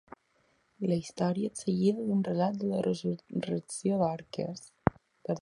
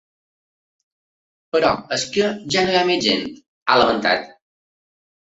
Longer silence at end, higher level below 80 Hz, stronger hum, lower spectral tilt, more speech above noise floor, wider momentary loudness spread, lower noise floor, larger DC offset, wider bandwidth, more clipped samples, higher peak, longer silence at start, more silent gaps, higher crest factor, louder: second, 0 s vs 0.9 s; about the same, -60 dBFS vs -56 dBFS; neither; first, -6.5 dB/octave vs -3.5 dB/octave; second, 40 dB vs over 72 dB; about the same, 8 LU vs 7 LU; second, -71 dBFS vs under -90 dBFS; neither; first, 11.5 kHz vs 8.2 kHz; neither; about the same, -4 dBFS vs -2 dBFS; second, 0.8 s vs 1.55 s; second, none vs 3.48-3.66 s; first, 28 dB vs 20 dB; second, -32 LUFS vs -19 LUFS